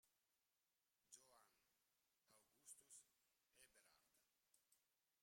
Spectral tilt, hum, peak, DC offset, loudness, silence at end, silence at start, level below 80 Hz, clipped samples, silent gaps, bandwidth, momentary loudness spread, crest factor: 0.5 dB/octave; none; -48 dBFS; under 0.1%; -67 LUFS; 0 s; 0 s; under -90 dBFS; under 0.1%; none; 16 kHz; 5 LU; 28 dB